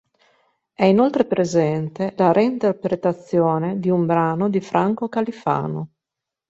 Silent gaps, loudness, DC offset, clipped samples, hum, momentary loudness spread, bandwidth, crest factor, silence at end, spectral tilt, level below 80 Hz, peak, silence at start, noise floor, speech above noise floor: none; -20 LUFS; under 0.1%; under 0.1%; none; 7 LU; 7.8 kHz; 18 dB; 0.65 s; -7.5 dB/octave; -60 dBFS; -2 dBFS; 0.8 s; -85 dBFS; 66 dB